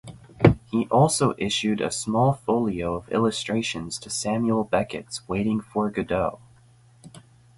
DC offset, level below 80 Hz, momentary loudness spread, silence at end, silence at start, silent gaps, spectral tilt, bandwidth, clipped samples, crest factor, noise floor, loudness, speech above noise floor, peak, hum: under 0.1%; -48 dBFS; 9 LU; 0.4 s; 0.05 s; none; -5 dB/octave; 11.5 kHz; under 0.1%; 24 dB; -55 dBFS; -24 LUFS; 31 dB; 0 dBFS; none